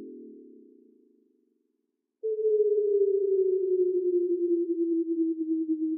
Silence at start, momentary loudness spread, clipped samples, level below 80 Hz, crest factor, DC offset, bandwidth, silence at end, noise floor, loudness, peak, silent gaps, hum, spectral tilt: 0 s; 6 LU; under 0.1%; under -90 dBFS; 12 dB; under 0.1%; 0.6 kHz; 0 s; -80 dBFS; -27 LUFS; -16 dBFS; none; none; -14 dB/octave